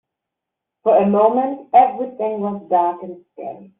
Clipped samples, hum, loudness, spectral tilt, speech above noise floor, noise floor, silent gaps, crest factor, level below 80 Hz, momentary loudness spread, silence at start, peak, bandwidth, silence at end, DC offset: under 0.1%; none; -17 LUFS; -7 dB/octave; 65 dB; -83 dBFS; none; 18 dB; -66 dBFS; 19 LU; 0.85 s; -2 dBFS; 3.9 kHz; 0.15 s; under 0.1%